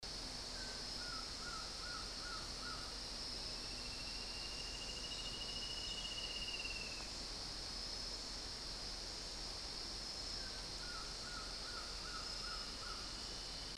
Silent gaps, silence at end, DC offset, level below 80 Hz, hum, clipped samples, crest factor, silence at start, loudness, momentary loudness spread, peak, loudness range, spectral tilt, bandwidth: none; 0 s; under 0.1%; -56 dBFS; none; under 0.1%; 14 dB; 0 s; -44 LUFS; 3 LU; -32 dBFS; 1 LU; -1.5 dB/octave; 13 kHz